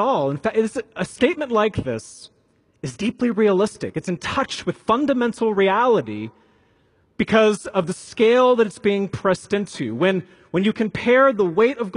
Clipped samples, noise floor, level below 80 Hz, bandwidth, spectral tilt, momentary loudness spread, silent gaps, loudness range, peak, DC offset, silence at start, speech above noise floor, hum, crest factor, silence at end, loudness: under 0.1%; -60 dBFS; -54 dBFS; 11.5 kHz; -5.5 dB/octave; 12 LU; none; 4 LU; -4 dBFS; under 0.1%; 0 s; 41 dB; none; 16 dB; 0 s; -20 LUFS